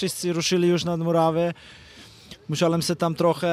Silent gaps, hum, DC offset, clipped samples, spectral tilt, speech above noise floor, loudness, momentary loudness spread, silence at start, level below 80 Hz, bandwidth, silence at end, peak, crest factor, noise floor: none; none; under 0.1%; under 0.1%; -5 dB/octave; 23 dB; -23 LUFS; 13 LU; 0 s; -60 dBFS; 15 kHz; 0 s; -8 dBFS; 16 dB; -46 dBFS